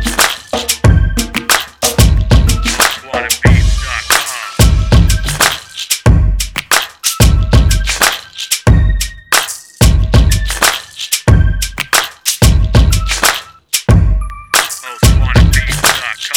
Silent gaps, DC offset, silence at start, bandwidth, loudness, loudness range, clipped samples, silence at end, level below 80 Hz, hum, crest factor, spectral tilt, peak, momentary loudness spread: none; 0.2%; 0 s; over 20 kHz; -12 LUFS; 1 LU; 0.5%; 0 s; -14 dBFS; none; 10 dB; -3.5 dB/octave; 0 dBFS; 6 LU